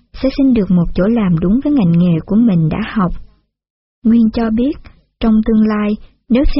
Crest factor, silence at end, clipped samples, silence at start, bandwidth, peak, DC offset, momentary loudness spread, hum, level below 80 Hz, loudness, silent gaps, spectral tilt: 12 dB; 0 s; under 0.1%; 0.15 s; 5.8 kHz; -2 dBFS; under 0.1%; 7 LU; none; -26 dBFS; -14 LUFS; 3.70-4.02 s; -8 dB/octave